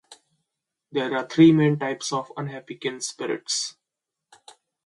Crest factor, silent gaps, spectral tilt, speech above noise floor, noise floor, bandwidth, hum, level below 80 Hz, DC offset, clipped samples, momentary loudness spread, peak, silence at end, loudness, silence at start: 20 dB; none; -5 dB/octave; 63 dB; -85 dBFS; 11.5 kHz; none; -68 dBFS; under 0.1%; under 0.1%; 17 LU; -4 dBFS; 1.15 s; -23 LUFS; 0.1 s